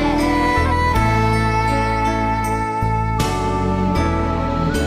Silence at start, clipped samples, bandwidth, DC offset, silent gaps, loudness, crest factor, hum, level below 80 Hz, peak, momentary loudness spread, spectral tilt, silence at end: 0 s; under 0.1%; 15.5 kHz; under 0.1%; none; -18 LUFS; 12 dB; none; -26 dBFS; -4 dBFS; 4 LU; -6 dB/octave; 0 s